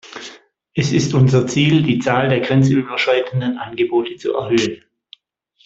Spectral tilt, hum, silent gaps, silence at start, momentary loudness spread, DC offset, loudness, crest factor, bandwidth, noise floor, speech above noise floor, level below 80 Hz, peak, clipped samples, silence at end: -6 dB/octave; none; none; 0.05 s; 10 LU; under 0.1%; -17 LUFS; 16 dB; 7.8 kHz; -60 dBFS; 44 dB; -52 dBFS; -2 dBFS; under 0.1%; 0.9 s